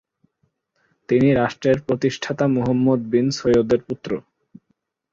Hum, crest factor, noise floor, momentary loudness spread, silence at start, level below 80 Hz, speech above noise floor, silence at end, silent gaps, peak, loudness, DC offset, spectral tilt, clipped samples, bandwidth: none; 16 dB; -70 dBFS; 9 LU; 1.1 s; -52 dBFS; 51 dB; 0.9 s; none; -4 dBFS; -20 LUFS; under 0.1%; -7 dB/octave; under 0.1%; 7.6 kHz